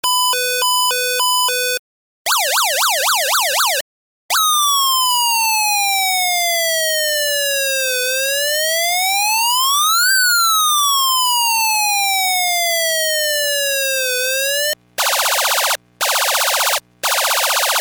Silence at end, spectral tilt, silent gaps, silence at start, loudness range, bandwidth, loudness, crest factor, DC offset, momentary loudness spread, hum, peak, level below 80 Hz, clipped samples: 0 s; 3.5 dB/octave; 1.79-2.25 s, 3.81-4.29 s; 0.05 s; 3 LU; over 20 kHz; -14 LUFS; 14 dB; under 0.1%; 4 LU; none; -2 dBFS; -68 dBFS; under 0.1%